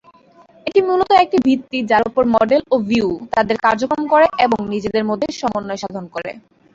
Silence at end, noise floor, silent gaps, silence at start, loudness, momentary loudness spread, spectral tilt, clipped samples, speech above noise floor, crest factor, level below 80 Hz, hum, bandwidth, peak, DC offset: 0.35 s; -48 dBFS; none; 0.65 s; -17 LUFS; 13 LU; -5.5 dB/octave; under 0.1%; 32 dB; 16 dB; -50 dBFS; none; 7.8 kHz; -2 dBFS; under 0.1%